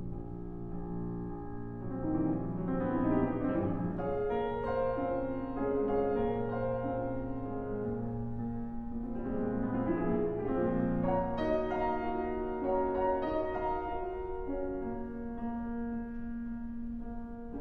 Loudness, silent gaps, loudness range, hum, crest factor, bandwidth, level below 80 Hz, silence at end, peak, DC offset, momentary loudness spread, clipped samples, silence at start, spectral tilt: -35 LUFS; none; 4 LU; none; 14 dB; 4.8 kHz; -46 dBFS; 0 s; -18 dBFS; under 0.1%; 10 LU; under 0.1%; 0 s; -10.5 dB/octave